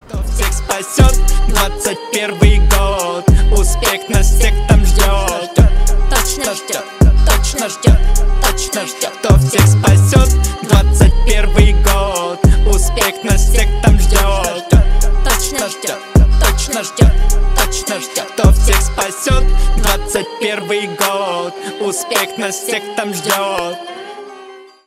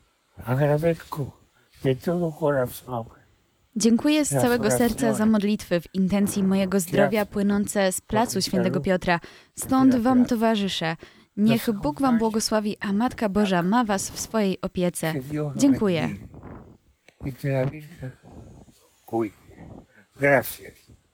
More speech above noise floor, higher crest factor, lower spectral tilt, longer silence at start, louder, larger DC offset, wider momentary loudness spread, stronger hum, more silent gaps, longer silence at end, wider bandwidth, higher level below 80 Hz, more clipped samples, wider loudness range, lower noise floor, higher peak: second, 25 dB vs 40 dB; second, 12 dB vs 18 dB; about the same, -4.5 dB/octave vs -5.5 dB/octave; second, 0.1 s vs 0.4 s; first, -14 LUFS vs -23 LUFS; neither; second, 8 LU vs 14 LU; neither; neither; second, 0.3 s vs 0.45 s; second, 16 kHz vs 19.5 kHz; first, -14 dBFS vs -52 dBFS; neither; about the same, 5 LU vs 6 LU; second, -36 dBFS vs -63 dBFS; first, 0 dBFS vs -4 dBFS